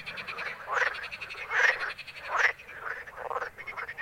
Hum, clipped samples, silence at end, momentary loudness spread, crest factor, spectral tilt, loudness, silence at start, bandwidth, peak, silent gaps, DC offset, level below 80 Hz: none; under 0.1%; 0 s; 13 LU; 22 dB; -1 dB/octave; -30 LUFS; 0 s; 16.5 kHz; -10 dBFS; none; under 0.1%; -64 dBFS